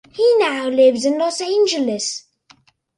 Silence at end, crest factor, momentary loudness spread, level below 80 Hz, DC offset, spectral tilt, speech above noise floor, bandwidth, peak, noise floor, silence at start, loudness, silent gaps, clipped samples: 0.8 s; 14 dB; 9 LU; -66 dBFS; under 0.1%; -2.5 dB/octave; 37 dB; 11 kHz; -4 dBFS; -54 dBFS; 0.15 s; -17 LUFS; none; under 0.1%